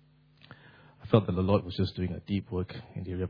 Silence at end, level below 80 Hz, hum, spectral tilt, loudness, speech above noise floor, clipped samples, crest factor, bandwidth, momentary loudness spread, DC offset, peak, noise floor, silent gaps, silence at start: 0 s; -54 dBFS; none; -10 dB/octave; -30 LUFS; 31 dB; under 0.1%; 24 dB; 5.2 kHz; 13 LU; under 0.1%; -8 dBFS; -60 dBFS; none; 0.5 s